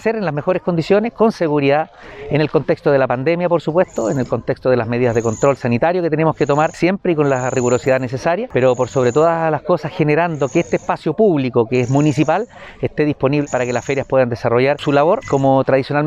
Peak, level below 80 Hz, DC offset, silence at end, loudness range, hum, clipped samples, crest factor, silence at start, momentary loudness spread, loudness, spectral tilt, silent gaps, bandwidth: -2 dBFS; -48 dBFS; under 0.1%; 0 s; 1 LU; none; under 0.1%; 14 dB; 0 s; 5 LU; -16 LUFS; -6.5 dB/octave; none; 9.6 kHz